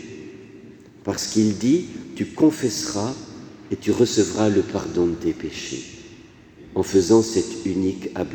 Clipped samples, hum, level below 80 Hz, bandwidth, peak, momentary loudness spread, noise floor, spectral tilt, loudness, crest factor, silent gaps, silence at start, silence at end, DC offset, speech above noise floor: under 0.1%; none; -54 dBFS; 19.5 kHz; -4 dBFS; 19 LU; -46 dBFS; -5 dB/octave; -22 LUFS; 20 dB; none; 0 s; 0 s; under 0.1%; 25 dB